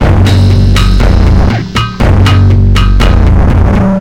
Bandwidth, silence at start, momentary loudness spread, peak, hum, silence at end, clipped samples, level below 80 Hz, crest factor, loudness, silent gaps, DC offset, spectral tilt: 10.5 kHz; 0 s; 4 LU; 0 dBFS; none; 0 s; 0.2%; -10 dBFS; 6 dB; -8 LUFS; none; 0.6%; -7 dB/octave